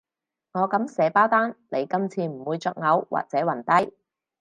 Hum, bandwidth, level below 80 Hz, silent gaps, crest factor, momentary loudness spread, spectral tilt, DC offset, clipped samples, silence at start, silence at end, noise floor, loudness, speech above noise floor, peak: none; 10.5 kHz; -74 dBFS; none; 20 dB; 9 LU; -6.5 dB/octave; under 0.1%; under 0.1%; 0.55 s; 0.5 s; -83 dBFS; -24 LUFS; 60 dB; -4 dBFS